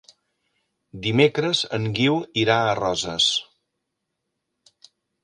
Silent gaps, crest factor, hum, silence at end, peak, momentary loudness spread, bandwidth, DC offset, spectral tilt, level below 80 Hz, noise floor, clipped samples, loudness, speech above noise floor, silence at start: none; 24 dB; none; 1.8 s; -2 dBFS; 6 LU; 10.5 kHz; under 0.1%; -4 dB/octave; -58 dBFS; -79 dBFS; under 0.1%; -21 LUFS; 58 dB; 0.95 s